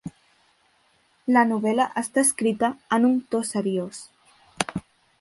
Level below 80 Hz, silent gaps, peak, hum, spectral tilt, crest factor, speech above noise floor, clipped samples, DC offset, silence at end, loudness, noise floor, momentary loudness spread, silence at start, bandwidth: -62 dBFS; none; -2 dBFS; none; -4 dB/octave; 22 dB; 41 dB; under 0.1%; under 0.1%; 0.4 s; -23 LUFS; -64 dBFS; 15 LU; 0.05 s; 12 kHz